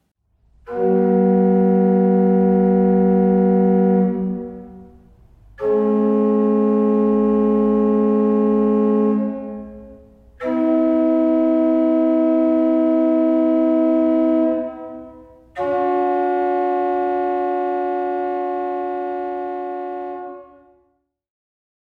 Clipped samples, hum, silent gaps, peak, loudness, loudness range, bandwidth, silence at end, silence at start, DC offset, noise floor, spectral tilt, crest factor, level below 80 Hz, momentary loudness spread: under 0.1%; none; none; -6 dBFS; -18 LUFS; 7 LU; 3.9 kHz; 1.5 s; 0.65 s; under 0.1%; -66 dBFS; -11 dB/octave; 12 dB; -52 dBFS; 13 LU